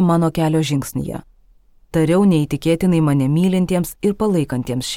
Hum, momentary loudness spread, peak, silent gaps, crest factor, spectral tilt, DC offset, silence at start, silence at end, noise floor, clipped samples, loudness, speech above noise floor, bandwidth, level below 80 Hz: none; 9 LU; -4 dBFS; none; 14 dB; -7 dB/octave; under 0.1%; 0 s; 0 s; -51 dBFS; under 0.1%; -18 LUFS; 34 dB; 16.5 kHz; -44 dBFS